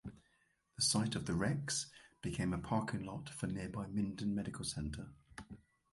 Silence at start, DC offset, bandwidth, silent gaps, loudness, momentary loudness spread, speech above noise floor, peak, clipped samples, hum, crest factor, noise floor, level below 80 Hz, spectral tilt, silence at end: 0.05 s; under 0.1%; 11.5 kHz; none; -39 LUFS; 19 LU; 38 dB; -20 dBFS; under 0.1%; none; 20 dB; -77 dBFS; -58 dBFS; -4 dB/octave; 0.35 s